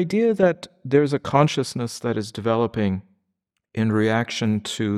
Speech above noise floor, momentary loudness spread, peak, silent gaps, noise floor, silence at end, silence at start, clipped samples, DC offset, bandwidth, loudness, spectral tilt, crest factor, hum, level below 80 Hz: 57 dB; 8 LU; -4 dBFS; none; -78 dBFS; 0 s; 0 s; under 0.1%; under 0.1%; 13.5 kHz; -22 LUFS; -6 dB/octave; 18 dB; none; -58 dBFS